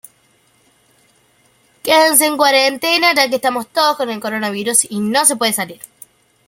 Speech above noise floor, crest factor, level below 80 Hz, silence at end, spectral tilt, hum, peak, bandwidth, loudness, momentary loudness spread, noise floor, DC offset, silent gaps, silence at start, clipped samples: 41 dB; 16 dB; -66 dBFS; 0.75 s; -1.5 dB/octave; none; 0 dBFS; 17 kHz; -14 LUFS; 10 LU; -56 dBFS; under 0.1%; none; 1.85 s; under 0.1%